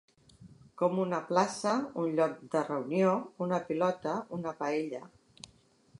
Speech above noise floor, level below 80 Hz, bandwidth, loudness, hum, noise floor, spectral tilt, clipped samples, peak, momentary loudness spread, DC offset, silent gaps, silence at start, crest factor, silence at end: 33 dB; -74 dBFS; 11.5 kHz; -32 LUFS; none; -64 dBFS; -6 dB/octave; under 0.1%; -12 dBFS; 12 LU; under 0.1%; none; 0.4 s; 20 dB; 0.95 s